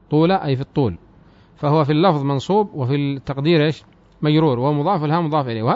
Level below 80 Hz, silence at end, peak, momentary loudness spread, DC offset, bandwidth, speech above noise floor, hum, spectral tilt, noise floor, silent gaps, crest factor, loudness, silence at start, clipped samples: -52 dBFS; 0 s; -4 dBFS; 7 LU; under 0.1%; 7.6 kHz; 31 dB; none; -8.5 dB/octave; -49 dBFS; none; 14 dB; -19 LUFS; 0.1 s; under 0.1%